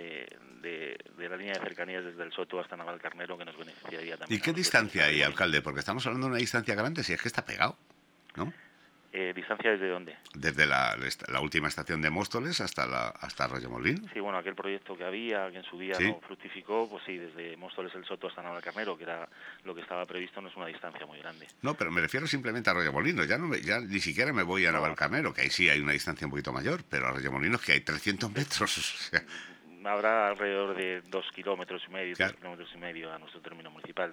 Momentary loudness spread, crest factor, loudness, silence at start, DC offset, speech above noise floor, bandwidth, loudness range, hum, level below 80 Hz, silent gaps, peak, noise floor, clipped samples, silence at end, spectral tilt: 17 LU; 26 dB; -31 LUFS; 0 s; under 0.1%; 28 dB; 20 kHz; 11 LU; none; -62 dBFS; none; -6 dBFS; -61 dBFS; under 0.1%; 0 s; -4 dB/octave